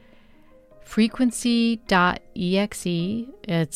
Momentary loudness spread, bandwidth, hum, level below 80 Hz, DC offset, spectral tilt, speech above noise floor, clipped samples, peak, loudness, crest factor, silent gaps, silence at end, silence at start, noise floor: 9 LU; 14.5 kHz; none; -50 dBFS; under 0.1%; -5 dB/octave; 29 dB; under 0.1%; -8 dBFS; -23 LUFS; 16 dB; none; 0 s; 0.85 s; -51 dBFS